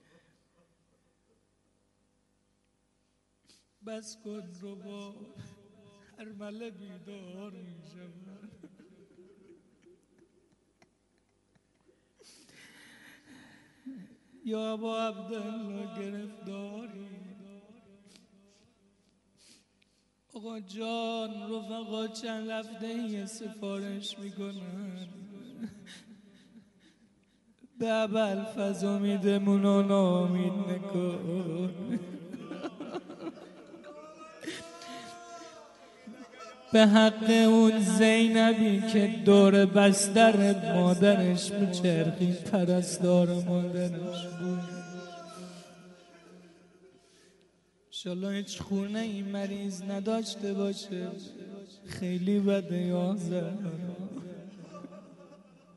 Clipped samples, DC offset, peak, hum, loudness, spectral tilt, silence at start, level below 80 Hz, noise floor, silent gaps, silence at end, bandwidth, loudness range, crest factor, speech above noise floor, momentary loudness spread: under 0.1%; under 0.1%; -8 dBFS; none; -28 LUFS; -5.5 dB/octave; 3.85 s; -74 dBFS; -74 dBFS; none; 0.4 s; 11.5 kHz; 24 LU; 22 dB; 46 dB; 25 LU